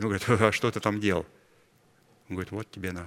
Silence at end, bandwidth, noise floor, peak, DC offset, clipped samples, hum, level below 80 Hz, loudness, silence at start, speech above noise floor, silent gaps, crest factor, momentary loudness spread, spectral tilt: 0 s; 16 kHz; -63 dBFS; -4 dBFS; under 0.1%; under 0.1%; none; -58 dBFS; -28 LUFS; 0 s; 35 dB; none; 26 dB; 14 LU; -5.5 dB/octave